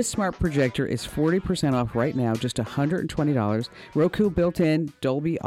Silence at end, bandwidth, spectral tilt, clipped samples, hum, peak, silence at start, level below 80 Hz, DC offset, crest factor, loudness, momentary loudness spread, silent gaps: 0 s; 16 kHz; -6 dB/octave; under 0.1%; none; -12 dBFS; 0 s; -44 dBFS; under 0.1%; 12 dB; -25 LUFS; 5 LU; none